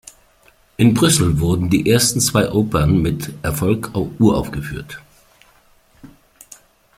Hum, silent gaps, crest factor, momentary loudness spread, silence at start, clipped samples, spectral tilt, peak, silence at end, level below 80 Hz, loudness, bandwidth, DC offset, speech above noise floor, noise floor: none; none; 16 dB; 14 LU; 0.8 s; under 0.1%; -5 dB/octave; -2 dBFS; 0.9 s; -38 dBFS; -17 LUFS; 16.5 kHz; under 0.1%; 37 dB; -53 dBFS